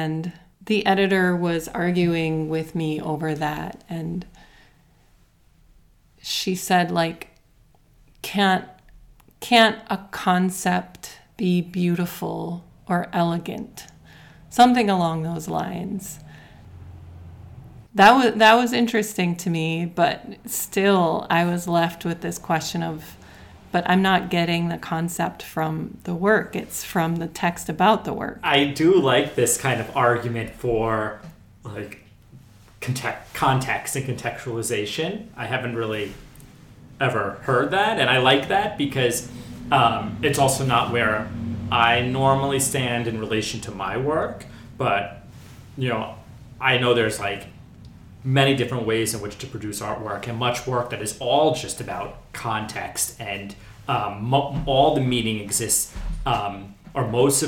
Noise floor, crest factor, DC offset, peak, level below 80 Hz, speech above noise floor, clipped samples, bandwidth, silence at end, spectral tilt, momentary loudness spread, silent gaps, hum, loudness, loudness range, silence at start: -57 dBFS; 20 dB; under 0.1%; -4 dBFS; -48 dBFS; 35 dB; under 0.1%; 19 kHz; 0 s; -4.5 dB/octave; 15 LU; none; none; -22 LUFS; 7 LU; 0 s